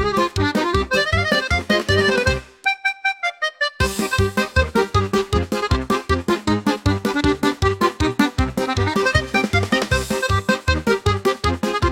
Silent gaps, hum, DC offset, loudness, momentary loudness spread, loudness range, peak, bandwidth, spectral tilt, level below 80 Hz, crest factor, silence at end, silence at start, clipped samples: none; none; under 0.1%; -19 LUFS; 4 LU; 1 LU; -2 dBFS; 17 kHz; -5 dB/octave; -32 dBFS; 18 dB; 0 s; 0 s; under 0.1%